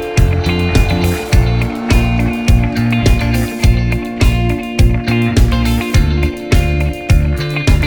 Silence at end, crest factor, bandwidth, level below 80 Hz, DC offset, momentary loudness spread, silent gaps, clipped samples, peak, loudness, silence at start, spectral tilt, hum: 0 s; 12 dB; over 20 kHz; -16 dBFS; under 0.1%; 3 LU; none; under 0.1%; 0 dBFS; -14 LUFS; 0 s; -6 dB/octave; none